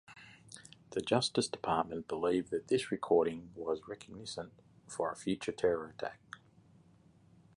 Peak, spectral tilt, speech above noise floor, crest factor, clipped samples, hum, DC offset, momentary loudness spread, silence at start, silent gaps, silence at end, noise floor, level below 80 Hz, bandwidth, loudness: -14 dBFS; -4.5 dB/octave; 29 dB; 22 dB; under 0.1%; none; under 0.1%; 21 LU; 0.1 s; none; 1.2 s; -64 dBFS; -68 dBFS; 11.5 kHz; -35 LUFS